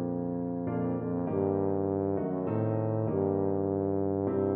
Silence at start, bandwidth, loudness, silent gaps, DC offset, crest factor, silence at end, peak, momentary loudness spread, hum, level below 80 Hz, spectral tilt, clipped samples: 0 s; 3 kHz; -30 LUFS; none; under 0.1%; 14 dB; 0 s; -16 dBFS; 4 LU; none; -64 dBFS; -12 dB/octave; under 0.1%